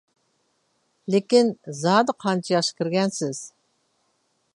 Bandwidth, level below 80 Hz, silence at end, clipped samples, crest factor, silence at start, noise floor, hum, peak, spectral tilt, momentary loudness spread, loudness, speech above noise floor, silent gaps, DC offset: 11.5 kHz; -76 dBFS; 1.1 s; under 0.1%; 20 dB; 1.1 s; -70 dBFS; none; -4 dBFS; -5 dB/octave; 12 LU; -22 LUFS; 48 dB; none; under 0.1%